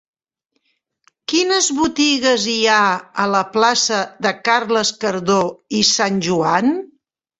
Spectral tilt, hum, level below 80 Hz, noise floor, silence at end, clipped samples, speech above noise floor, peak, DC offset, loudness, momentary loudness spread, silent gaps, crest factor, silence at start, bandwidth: -2.5 dB/octave; none; -58 dBFS; -72 dBFS; 0.55 s; under 0.1%; 55 dB; 0 dBFS; under 0.1%; -16 LUFS; 6 LU; none; 18 dB; 1.3 s; 8.4 kHz